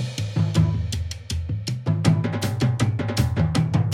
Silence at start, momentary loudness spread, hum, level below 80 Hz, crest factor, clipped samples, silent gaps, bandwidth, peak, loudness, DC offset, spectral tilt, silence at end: 0 s; 7 LU; none; -38 dBFS; 18 dB; under 0.1%; none; 16 kHz; -4 dBFS; -23 LUFS; under 0.1%; -6.5 dB/octave; 0 s